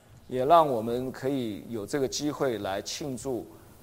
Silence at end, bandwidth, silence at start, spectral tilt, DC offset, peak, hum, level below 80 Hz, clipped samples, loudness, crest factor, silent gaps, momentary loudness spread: 0.1 s; 16 kHz; 0.1 s; -5 dB/octave; under 0.1%; -8 dBFS; none; -60 dBFS; under 0.1%; -28 LUFS; 22 dB; none; 14 LU